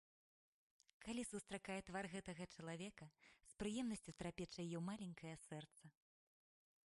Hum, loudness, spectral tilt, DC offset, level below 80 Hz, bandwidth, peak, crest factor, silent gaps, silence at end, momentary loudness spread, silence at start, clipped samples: none; -51 LUFS; -5 dB/octave; under 0.1%; -74 dBFS; 11.5 kHz; -34 dBFS; 18 dB; none; 0.95 s; 15 LU; 1 s; under 0.1%